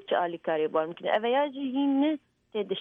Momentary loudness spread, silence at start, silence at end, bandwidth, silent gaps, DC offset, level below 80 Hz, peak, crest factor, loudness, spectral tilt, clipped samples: 9 LU; 0.1 s; 0 s; 3.8 kHz; none; under 0.1%; -80 dBFS; -12 dBFS; 16 dB; -28 LUFS; -7.5 dB/octave; under 0.1%